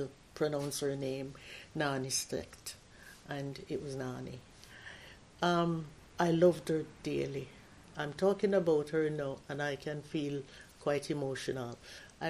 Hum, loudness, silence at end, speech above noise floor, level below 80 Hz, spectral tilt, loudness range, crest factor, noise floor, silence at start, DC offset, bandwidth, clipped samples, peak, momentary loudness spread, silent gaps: none; -35 LUFS; 0 s; 19 dB; -64 dBFS; -5 dB/octave; 6 LU; 20 dB; -54 dBFS; 0 s; under 0.1%; 14.5 kHz; under 0.1%; -14 dBFS; 20 LU; none